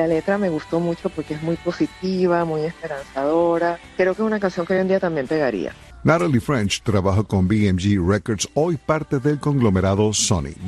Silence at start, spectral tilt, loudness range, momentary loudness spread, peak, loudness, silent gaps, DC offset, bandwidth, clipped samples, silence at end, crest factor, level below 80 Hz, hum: 0 s; -5.5 dB/octave; 3 LU; 6 LU; -2 dBFS; -21 LUFS; none; under 0.1%; 12.5 kHz; under 0.1%; 0 s; 18 dB; -44 dBFS; none